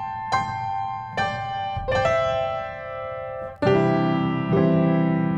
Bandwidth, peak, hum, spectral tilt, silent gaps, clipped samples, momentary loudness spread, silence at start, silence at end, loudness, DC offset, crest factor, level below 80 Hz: 8 kHz; -6 dBFS; none; -7.5 dB/octave; none; under 0.1%; 12 LU; 0 s; 0 s; -23 LUFS; under 0.1%; 16 dB; -46 dBFS